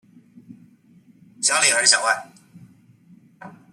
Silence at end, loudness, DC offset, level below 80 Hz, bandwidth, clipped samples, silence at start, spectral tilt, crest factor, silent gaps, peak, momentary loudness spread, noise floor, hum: 0.2 s; -17 LUFS; under 0.1%; -78 dBFS; 14.5 kHz; under 0.1%; 0.5 s; 1 dB/octave; 24 dB; none; -2 dBFS; 9 LU; -53 dBFS; none